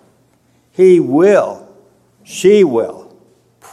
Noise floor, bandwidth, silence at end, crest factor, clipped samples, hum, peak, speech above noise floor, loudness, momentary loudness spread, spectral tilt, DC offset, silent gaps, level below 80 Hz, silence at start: -55 dBFS; 12.5 kHz; 0.75 s; 14 dB; under 0.1%; none; 0 dBFS; 45 dB; -12 LUFS; 19 LU; -6 dB/octave; under 0.1%; none; -62 dBFS; 0.8 s